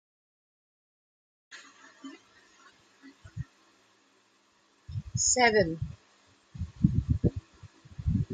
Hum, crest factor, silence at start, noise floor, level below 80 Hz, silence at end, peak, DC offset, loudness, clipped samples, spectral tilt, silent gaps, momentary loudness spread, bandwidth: none; 26 dB; 1.5 s; -67 dBFS; -46 dBFS; 0 s; -8 dBFS; under 0.1%; -28 LUFS; under 0.1%; -4 dB/octave; none; 27 LU; 9.8 kHz